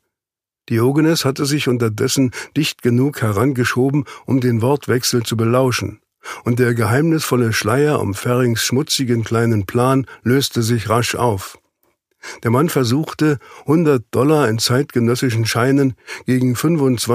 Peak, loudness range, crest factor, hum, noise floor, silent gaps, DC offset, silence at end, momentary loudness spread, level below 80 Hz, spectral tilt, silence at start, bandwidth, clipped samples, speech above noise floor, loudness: -2 dBFS; 2 LU; 14 dB; none; -88 dBFS; none; under 0.1%; 0 s; 5 LU; -54 dBFS; -5.5 dB/octave; 0.7 s; 15.5 kHz; under 0.1%; 72 dB; -17 LUFS